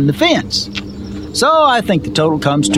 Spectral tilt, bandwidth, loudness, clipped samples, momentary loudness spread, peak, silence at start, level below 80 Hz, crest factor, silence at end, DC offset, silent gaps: -4.5 dB/octave; 16 kHz; -14 LUFS; under 0.1%; 13 LU; 0 dBFS; 0 s; -40 dBFS; 14 dB; 0 s; 0.3%; none